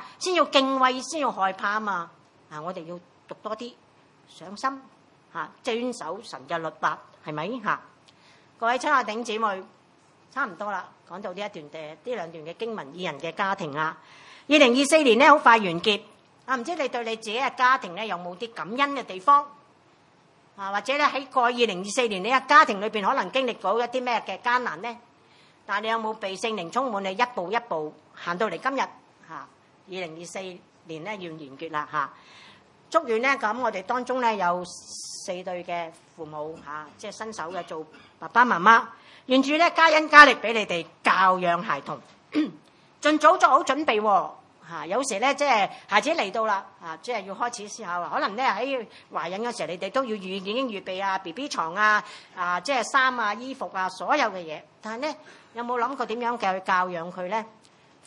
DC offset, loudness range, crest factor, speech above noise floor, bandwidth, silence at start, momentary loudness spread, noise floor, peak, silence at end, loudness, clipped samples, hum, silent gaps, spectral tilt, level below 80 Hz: under 0.1%; 14 LU; 26 dB; 34 dB; 11.5 kHz; 0 s; 19 LU; -59 dBFS; 0 dBFS; 0.6 s; -24 LUFS; under 0.1%; none; none; -3 dB/octave; -76 dBFS